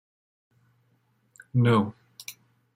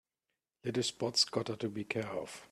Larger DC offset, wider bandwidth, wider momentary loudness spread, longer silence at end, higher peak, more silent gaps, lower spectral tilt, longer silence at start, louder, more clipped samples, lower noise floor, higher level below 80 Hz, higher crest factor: neither; about the same, 15.5 kHz vs 14.5 kHz; first, 21 LU vs 11 LU; first, 0.45 s vs 0.05 s; first, -10 dBFS vs -16 dBFS; neither; first, -7 dB/octave vs -3.5 dB/octave; first, 1.55 s vs 0.65 s; first, -25 LUFS vs -35 LUFS; neither; second, -68 dBFS vs -89 dBFS; first, -68 dBFS vs -74 dBFS; about the same, 20 dB vs 22 dB